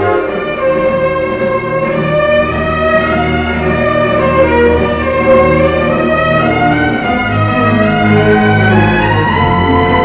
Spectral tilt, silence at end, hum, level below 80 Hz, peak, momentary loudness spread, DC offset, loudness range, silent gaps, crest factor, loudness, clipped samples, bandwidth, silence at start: -10.5 dB/octave; 0 s; none; -26 dBFS; 0 dBFS; 5 LU; under 0.1%; 2 LU; none; 10 dB; -11 LUFS; under 0.1%; 4 kHz; 0 s